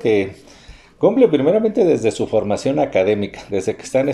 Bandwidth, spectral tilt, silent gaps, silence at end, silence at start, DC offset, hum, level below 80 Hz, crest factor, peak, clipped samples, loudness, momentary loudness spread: 11.5 kHz; -6 dB/octave; none; 0 s; 0 s; under 0.1%; none; -50 dBFS; 16 dB; -2 dBFS; under 0.1%; -18 LUFS; 9 LU